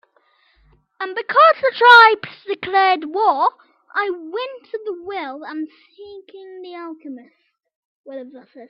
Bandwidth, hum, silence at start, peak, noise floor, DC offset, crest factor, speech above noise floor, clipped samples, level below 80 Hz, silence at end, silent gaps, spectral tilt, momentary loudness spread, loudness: 9.6 kHz; none; 1 s; 0 dBFS; -60 dBFS; under 0.1%; 18 dB; 42 dB; under 0.1%; -68 dBFS; 0.05 s; 7.76-8.04 s; -3.5 dB/octave; 26 LU; -15 LUFS